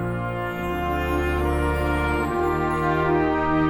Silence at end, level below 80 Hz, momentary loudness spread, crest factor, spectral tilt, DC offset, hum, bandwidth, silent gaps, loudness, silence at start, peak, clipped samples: 0 s; -32 dBFS; 6 LU; 12 dB; -7.5 dB/octave; under 0.1%; none; 18.5 kHz; none; -23 LUFS; 0 s; -10 dBFS; under 0.1%